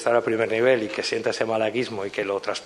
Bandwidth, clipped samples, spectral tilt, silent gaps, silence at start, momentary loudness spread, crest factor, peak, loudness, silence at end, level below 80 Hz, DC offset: 12 kHz; under 0.1%; -4 dB/octave; none; 0 s; 7 LU; 16 dB; -6 dBFS; -24 LUFS; 0 s; -68 dBFS; under 0.1%